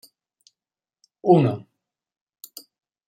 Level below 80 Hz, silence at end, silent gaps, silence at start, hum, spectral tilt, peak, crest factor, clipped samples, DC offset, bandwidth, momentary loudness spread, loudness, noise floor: -68 dBFS; 1.5 s; none; 1.25 s; none; -8.5 dB/octave; -4 dBFS; 22 dB; under 0.1%; under 0.1%; 16 kHz; 24 LU; -20 LUFS; under -90 dBFS